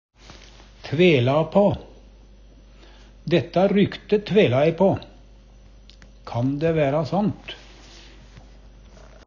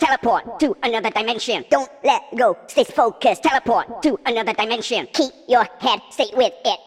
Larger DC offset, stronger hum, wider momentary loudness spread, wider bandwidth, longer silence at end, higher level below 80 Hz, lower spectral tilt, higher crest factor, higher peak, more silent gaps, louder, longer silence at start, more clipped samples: neither; first, 50 Hz at -45 dBFS vs none; first, 16 LU vs 4 LU; second, 7.2 kHz vs 14 kHz; first, 0.9 s vs 0.1 s; first, -48 dBFS vs -56 dBFS; first, -8 dB/octave vs -3 dB/octave; about the same, 18 dB vs 16 dB; about the same, -6 dBFS vs -4 dBFS; neither; about the same, -21 LUFS vs -19 LUFS; first, 0.85 s vs 0 s; neither